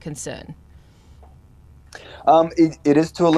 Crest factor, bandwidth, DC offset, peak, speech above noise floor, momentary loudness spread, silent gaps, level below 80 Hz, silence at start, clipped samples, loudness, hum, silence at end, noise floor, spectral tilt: 18 dB; 12.5 kHz; under 0.1%; -2 dBFS; 30 dB; 25 LU; none; -50 dBFS; 0.05 s; under 0.1%; -18 LUFS; none; 0 s; -48 dBFS; -6 dB/octave